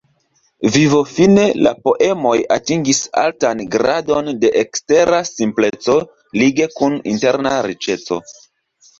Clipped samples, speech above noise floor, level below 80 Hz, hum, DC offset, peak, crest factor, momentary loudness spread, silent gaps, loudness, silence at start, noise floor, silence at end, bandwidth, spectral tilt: under 0.1%; 46 dB; -52 dBFS; none; under 0.1%; 0 dBFS; 14 dB; 7 LU; none; -15 LUFS; 0.6 s; -61 dBFS; 0.7 s; 8 kHz; -4.5 dB/octave